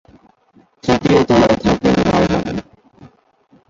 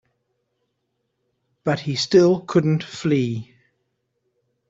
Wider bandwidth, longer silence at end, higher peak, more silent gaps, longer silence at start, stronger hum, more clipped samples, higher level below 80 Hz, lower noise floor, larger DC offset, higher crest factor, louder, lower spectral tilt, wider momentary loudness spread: about the same, 7.8 kHz vs 7.8 kHz; second, 1.1 s vs 1.25 s; about the same, -2 dBFS vs -4 dBFS; neither; second, 0.85 s vs 1.65 s; neither; neither; first, -38 dBFS vs -62 dBFS; second, -54 dBFS vs -75 dBFS; neither; about the same, 16 dB vs 20 dB; first, -15 LUFS vs -20 LUFS; about the same, -6.5 dB/octave vs -6.5 dB/octave; about the same, 13 LU vs 11 LU